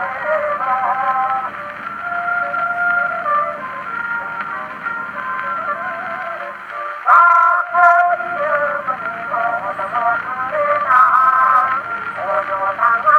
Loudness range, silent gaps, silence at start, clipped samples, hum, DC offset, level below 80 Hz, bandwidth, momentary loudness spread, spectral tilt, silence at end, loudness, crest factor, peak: 7 LU; none; 0 s; under 0.1%; none; under 0.1%; -64 dBFS; 9.2 kHz; 13 LU; -5 dB/octave; 0 s; -17 LUFS; 18 dB; 0 dBFS